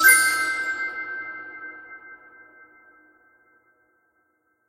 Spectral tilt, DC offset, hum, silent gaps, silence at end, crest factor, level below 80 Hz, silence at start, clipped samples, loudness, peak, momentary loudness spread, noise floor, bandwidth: 2 dB/octave; under 0.1%; none; none; 2.55 s; 24 dB; -68 dBFS; 0 s; under 0.1%; -22 LUFS; -2 dBFS; 26 LU; -69 dBFS; 16 kHz